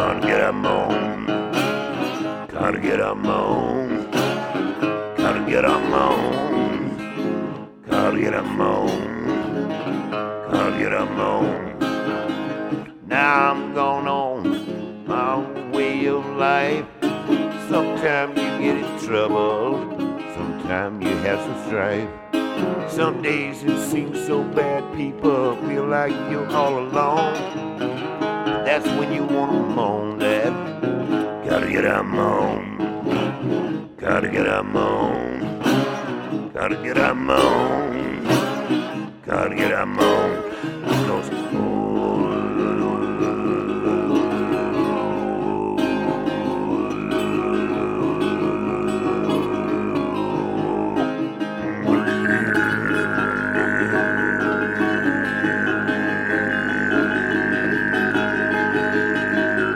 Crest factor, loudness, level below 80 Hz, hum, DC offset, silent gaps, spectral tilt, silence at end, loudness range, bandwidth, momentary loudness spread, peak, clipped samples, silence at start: 18 dB; -21 LUFS; -50 dBFS; none; under 0.1%; none; -6 dB/octave; 0 s; 3 LU; 16.5 kHz; 6 LU; -2 dBFS; under 0.1%; 0 s